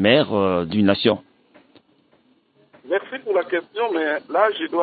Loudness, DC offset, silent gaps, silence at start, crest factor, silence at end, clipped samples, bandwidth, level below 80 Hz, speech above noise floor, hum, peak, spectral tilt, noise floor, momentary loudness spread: -21 LUFS; under 0.1%; none; 0 s; 20 dB; 0 s; under 0.1%; 4.8 kHz; -62 dBFS; 40 dB; none; -2 dBFS; -10.5 dB/octave; -60 dBFS; 8 LU